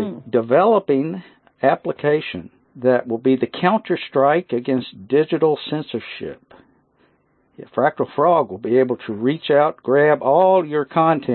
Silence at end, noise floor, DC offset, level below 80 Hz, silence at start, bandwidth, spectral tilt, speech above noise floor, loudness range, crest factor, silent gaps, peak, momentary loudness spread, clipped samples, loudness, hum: 0 s; -61 dBFS; under 0.1%; -66 dBFS; 0 s; 4.4 kHz; -11.5 dB/octave; 43 dB; 6 LU; 16 dB; none; -2 dBFS; 11 LU; under 0.1%; -18 LUFS; none